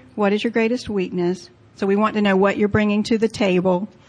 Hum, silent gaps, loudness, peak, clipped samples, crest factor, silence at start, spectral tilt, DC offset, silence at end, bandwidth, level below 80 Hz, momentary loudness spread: none; none; -20 LUFS; -6 dBFS; under 0.1%; 14 dB; 0.15 s; -6.5 dB/octave; under 0.1%; 0.2 s; 10 kHz; -50 dBFS; 7 LU